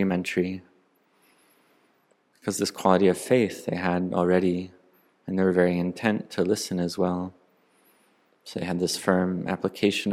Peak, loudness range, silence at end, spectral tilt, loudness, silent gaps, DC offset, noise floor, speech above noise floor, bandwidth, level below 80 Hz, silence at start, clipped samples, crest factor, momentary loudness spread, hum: -4 dBFS; 4 LU; 0 s; -5.5 dB/octave; -25 LUFS; none; under 0.1%; -66 dBFS; 41 dB; 15.5 kHz; -70 dBFS; 0 s; under 0.1%; 22 dB; 11 LU; none